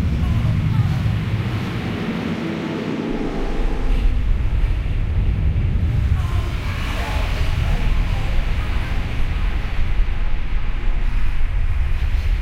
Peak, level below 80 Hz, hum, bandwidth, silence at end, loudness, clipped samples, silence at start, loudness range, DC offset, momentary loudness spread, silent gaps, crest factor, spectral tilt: -6 dBFS; -20 dBFS; none; 8.8 kHz; 0 s; -23 LUFS; under 0.1%; 0 s; 3 LU; under 0.1%; 5 LU; none; 12 dB; -7 dB/octave